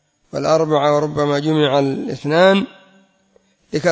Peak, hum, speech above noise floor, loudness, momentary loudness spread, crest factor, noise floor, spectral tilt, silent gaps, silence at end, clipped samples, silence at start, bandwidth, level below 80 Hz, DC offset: 0 dBFS; none; 42 dB; -17 LUFS; 11 LU; 18 dB; -58 dBFS; -6 dB/octave; none; 0 s; under 0.1%; 0.35 s; 8 kHz; -56 dBFS; under 0.1%